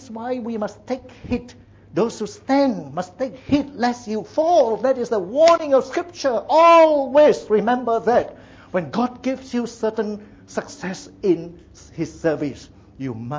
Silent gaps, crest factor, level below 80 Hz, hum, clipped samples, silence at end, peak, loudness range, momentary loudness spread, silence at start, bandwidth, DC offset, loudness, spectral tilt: none; 14 dB; -52 dBFS; none; under 0.1%; 0 s; -6 dBFS; 10 LU; 16 LU; 0 s; 8 kHz; under 0.1%; -20 LUFS; -5.5 dB/octave